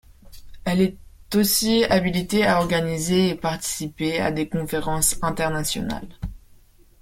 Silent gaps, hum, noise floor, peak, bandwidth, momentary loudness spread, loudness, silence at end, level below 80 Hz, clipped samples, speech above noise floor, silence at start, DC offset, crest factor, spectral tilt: none; none; -52 dBFS; -4 dBFS; 16.5 kHz; 10 LU; -22 LUFS; 0.65 s; -42 dBFS; under 0.1%; 30 dB; 0.25 s; under 0.1%; 18 dB; -4 dB/octave